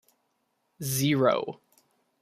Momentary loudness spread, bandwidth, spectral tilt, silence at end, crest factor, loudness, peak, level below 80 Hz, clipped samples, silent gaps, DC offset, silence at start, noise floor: 16 LU; 15.5 kHz; -5 dB/octave; 0.7 s; 20 dB; -26 LUFS; -10 dBFS; -68 dBFS; under 0.1%; none; under 0.1%; 0.8 s; -76 dBFS